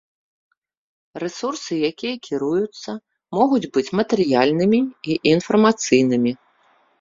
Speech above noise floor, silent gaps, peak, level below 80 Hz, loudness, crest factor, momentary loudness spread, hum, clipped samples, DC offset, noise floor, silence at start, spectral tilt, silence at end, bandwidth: 40 dB; none; 0 dBFS; -60 dBFS; -20 LUFS; 20 dB; 13 LU; none; under 0.1%; under 0.1%; -59 dBFS; 1.15 s; -5 dB/octave; 0.65 s; 7.8 kHz